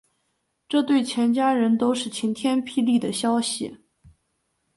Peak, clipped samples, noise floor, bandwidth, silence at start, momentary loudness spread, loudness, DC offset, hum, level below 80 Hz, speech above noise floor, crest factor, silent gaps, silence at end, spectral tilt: -10 dBFS; under 0.1%; -74 dBFS; 11.5 kHz; 0.7 s; 6 LU; -23 LUFS; under 0.1%; none; -66 dBFS; 52 dB; 14 dB; none; 1 s; -4 dB/octave